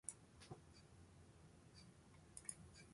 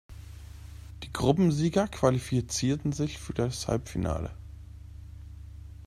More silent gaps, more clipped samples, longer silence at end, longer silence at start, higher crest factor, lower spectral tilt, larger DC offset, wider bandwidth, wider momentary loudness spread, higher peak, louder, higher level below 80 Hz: neither; neither; about the same, 0 s vs 0 s; about the same, 0.05 s vs 0.1 s; first, 32 dB vs 22 dB; second, -3 dB/octave vs -6 dB/octave; neither; second, 11.5 kHz vs 14.5 kHz; second, 12 LU vs 22 LU; second, -30 dBFS vs -8 dBFS; second, -60 LUFS vs -29 LUFS; second, -74 dBFS vs -46 dBFS